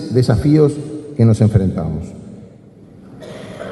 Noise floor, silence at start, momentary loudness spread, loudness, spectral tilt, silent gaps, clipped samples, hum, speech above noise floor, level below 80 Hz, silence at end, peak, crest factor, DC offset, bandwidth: -41 dBFS; 0 s; 22 LU; -15 LUFS; -8.5 dB/octave; none; under 0.1%; none; 28 dB; -36 dBFS; 0 s; 0 dBFS; 16 dB; under 0.1%; 11.5 kHz